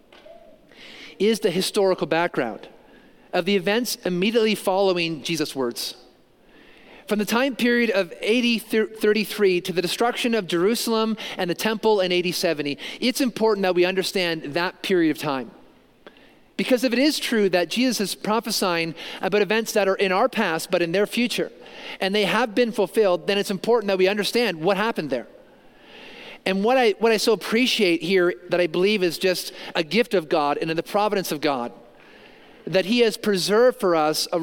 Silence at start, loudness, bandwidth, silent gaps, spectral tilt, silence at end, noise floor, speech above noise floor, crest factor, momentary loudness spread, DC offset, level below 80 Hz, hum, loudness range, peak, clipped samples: 0.3 s; -22 LUFS; 17 kHz; none; -4 dB/octave; 0 s; -54 dBFS; 32 dB; 18 dB; 8 LU; under 0.1%; -64 dBFS; none; 3 LU; -4 dBFS; under 0.1%